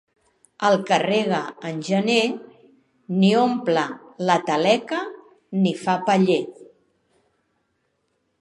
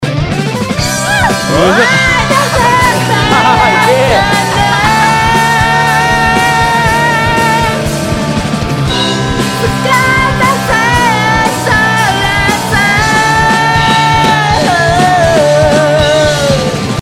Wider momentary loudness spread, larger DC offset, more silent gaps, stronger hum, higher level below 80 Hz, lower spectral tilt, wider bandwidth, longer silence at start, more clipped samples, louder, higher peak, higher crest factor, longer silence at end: first, 11 LU vs 5 LU; neither; neither; neither; second, -74 dBFS vs -26 dBFS; first, -5.5 dB/octave vs -4 dB/octave; second, 11 kHz vs 16.5 kHz; first, 0.6 s vs 0 s; second, under 0.1% vs 0.2%; second, -21 LUFS vs -9 LUFS; about the same, -2 dBFS vs 0 dBFS; first, 20 dB vs 8 dB; first, 1.75 s vs 0 s